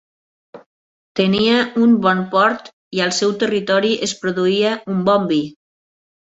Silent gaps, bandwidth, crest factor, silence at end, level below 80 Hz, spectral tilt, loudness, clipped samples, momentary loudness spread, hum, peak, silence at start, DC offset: 0.66-1.15 s, 2.73-2.91 s; 8 kHz; 16 dB; 0.8 s; -60 dBFS; -4.5 dB/octave; -17 LUFS; under 0.1%; 7 LU; none; -2 dBFS; 0.55 s; under 0.1%